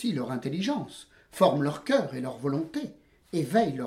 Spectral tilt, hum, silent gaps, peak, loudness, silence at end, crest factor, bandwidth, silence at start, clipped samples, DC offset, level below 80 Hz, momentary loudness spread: -6 dB/octave; none; none; -8 dBFS; -28 LUFS; 0 s; 20 dB; 16 kHz; 0 s; under 0.1%; under 0.1%; -66 dBFS; 16 LU